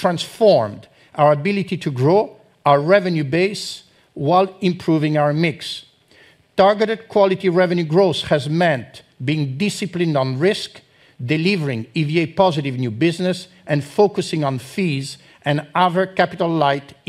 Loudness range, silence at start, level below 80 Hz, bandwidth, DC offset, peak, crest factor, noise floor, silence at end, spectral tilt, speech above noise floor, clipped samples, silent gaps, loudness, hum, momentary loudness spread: 3 LU; 0 s; -60 dBFS; 13.5 kHz; under 0.1%; 0 dBFS; 18 dB; -51 dBFS; 0.15 s; -6.5 dB/octave; 33 dB; under 0.1%; none; -19 LUFS; none; 10 LU